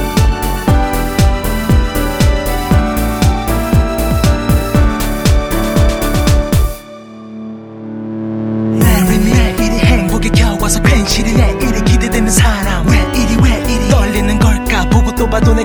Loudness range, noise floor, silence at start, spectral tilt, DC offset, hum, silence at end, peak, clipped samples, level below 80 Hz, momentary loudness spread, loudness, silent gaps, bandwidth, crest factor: 4 LU; -31 dBFS; 0 s; -5.5 dB/octave; under 0.1%; none; 0 s; 0 dBFS; under 0.1%; -16 dBFS; 8 LU; -13 LUFS; none; over 20 kHz; 12 dB